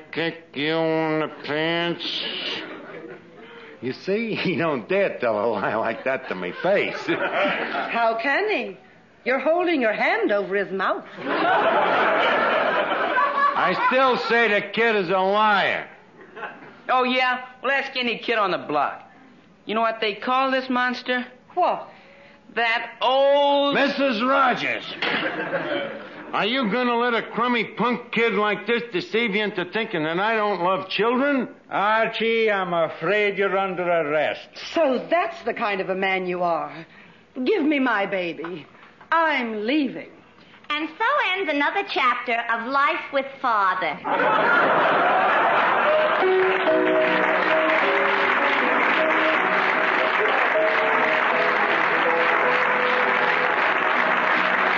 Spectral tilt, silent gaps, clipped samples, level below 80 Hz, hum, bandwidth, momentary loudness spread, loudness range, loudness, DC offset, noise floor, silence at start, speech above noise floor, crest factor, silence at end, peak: -5.5 dB/octave; none; under 0.1%; -72 dBFS; none; 7.4 kHz; 9 LU; 6 LU; -21 LUFS; under 0.1%; -51 dBFS; 0 s; 29 dB; 14 dB; 0 s; -8 dBFS